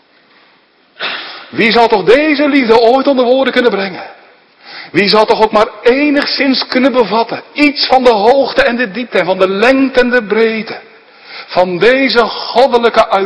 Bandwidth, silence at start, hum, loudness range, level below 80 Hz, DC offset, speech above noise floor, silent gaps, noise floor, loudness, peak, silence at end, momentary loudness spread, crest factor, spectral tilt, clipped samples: 11 kHz; 1 s; none; 2 LU; -44 dBFS; under 0.1%; 39 dB; none; -49 dBFS; -10 LUFS; 0 dBFS; 0 s; 12 LU; 10 dB; -5 dB/octave; 1%